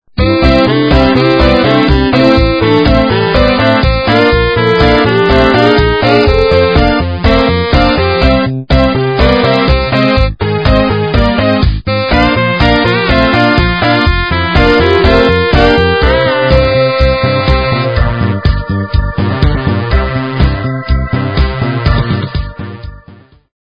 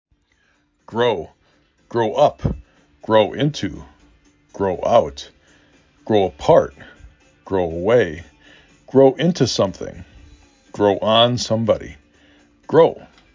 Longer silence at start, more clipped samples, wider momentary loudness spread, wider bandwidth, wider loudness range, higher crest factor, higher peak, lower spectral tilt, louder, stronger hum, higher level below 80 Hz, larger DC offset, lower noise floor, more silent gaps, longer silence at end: second, 0.15 s vs 0.9 s; first, 0.9% vs under 0.1%; second, 6 LU vs 19 LU; about the same, 8 kHz vs 7.6 kHz; about the same, 5 LU vs 3 LU; second, 10 dB vs 18 dB; about the same, 0 dBFS vs -2 dBFS; first, -8 dB/octave vs -5.5 dB/octave; first, -10 LUFS vs -18 LUFS; neither; first, -16 dBFS vs -44 dBFS; first, 0.7% vs under 0.1%; second, -38 dBFS vs -62 dBFS; neither; first, 0.6 s vs 0.3 s